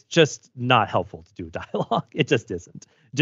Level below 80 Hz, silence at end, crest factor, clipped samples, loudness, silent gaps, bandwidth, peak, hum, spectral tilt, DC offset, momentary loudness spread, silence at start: -58 dBFS; 0 s; 22 dB; under 0.1%; -23 LUFS; none; 8 kHz; -2 dBFS; none; -5 dB/octave; under 0.1%; 16 LU; 0.1 s